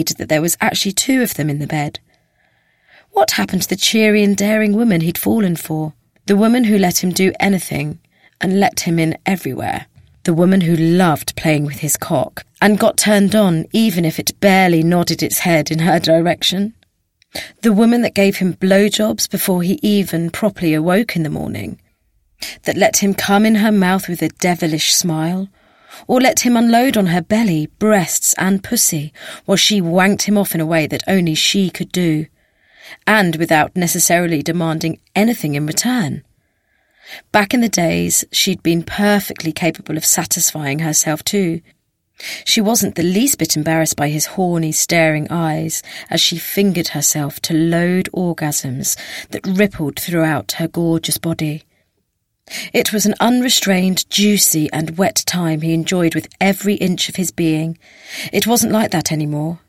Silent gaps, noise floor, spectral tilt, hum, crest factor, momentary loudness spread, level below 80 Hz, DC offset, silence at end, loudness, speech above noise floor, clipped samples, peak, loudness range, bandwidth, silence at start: none; -69 dBFS; -4 dB/octave; none; 16 dB; 10 LU; -50 dBFS; under 0.1%; 0.1 s; -15 LUFS; 53 dB; under 0.1%; 0 dBFS; 4 LU; 16.5 kHz; 0 s